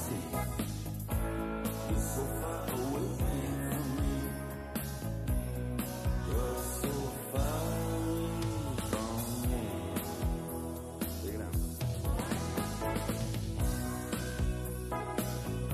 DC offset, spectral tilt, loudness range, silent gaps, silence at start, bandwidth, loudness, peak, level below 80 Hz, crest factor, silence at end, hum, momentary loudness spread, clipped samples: under 0.1%; -5.5 dB/octave; 1 LU; none; 0 s; 14.5 kHz; -36 LUFS; -18 dBFS; -40 dBFS; 16 dB; 0 s; none; 4 LU; under 0.1%